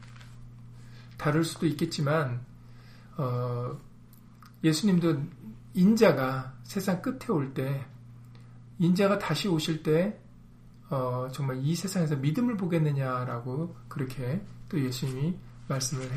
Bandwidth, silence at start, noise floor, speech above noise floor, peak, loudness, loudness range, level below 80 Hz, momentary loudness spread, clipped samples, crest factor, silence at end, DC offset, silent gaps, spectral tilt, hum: 15.5 kHz; 0 s; -51 dBFS; 24 dB; -8 dBFS; -29 LUFS; 5 LU; -56 dBFS; 22 LU; under 0.1%; 22 dB; 0 s; under 0.1%; none; -6 dB/octave; 60 Hz at -50 dBFS